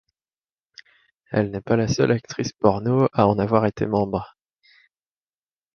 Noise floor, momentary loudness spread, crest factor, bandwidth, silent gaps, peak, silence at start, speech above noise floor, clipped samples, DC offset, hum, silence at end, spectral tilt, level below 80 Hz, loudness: under -90 dBFS; 8 LU; 22 dB; 7 kHz; none; -2 dBFS; 1.3 s; over 69 dB; under 0.1%; under 0.1%; none; 1.5 s; -7 dB/octave; -50 dBFS; -22 LUFS